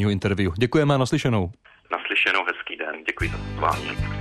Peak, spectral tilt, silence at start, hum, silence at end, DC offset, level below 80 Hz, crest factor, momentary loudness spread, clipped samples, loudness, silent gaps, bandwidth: -8 dBFS; -6 dB/octave; 0 s; none; 0 s; under 0.1%; -40 dBFS; 16 dB; 10 LU; under 0.1%; -23 LUFS; none; 13.5 kHz